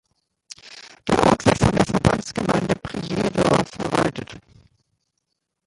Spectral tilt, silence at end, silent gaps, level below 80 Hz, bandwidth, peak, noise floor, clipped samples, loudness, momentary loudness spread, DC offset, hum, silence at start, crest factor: -5.5 dB/octave; 1.25 s; none; -42 dBFS; 11.5 kHz; -2 dBFS; -77 dBFS; under 0.1%; -20 LUFS; 21 LU; under 0.1%; none; 0.65 s; 20 dB